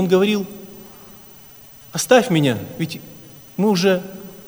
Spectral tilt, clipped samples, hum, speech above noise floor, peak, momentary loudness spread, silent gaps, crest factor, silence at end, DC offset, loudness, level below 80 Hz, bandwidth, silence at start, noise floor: -5 dB/octave; under 0.1%; none; 26 dB; 0 dBFS; 25 LU; none; 20 dB; 0.05 s; under 0.1%; -19 LUFS; -58 dBFS; over 20 kHz; 0 s; -43 dBFS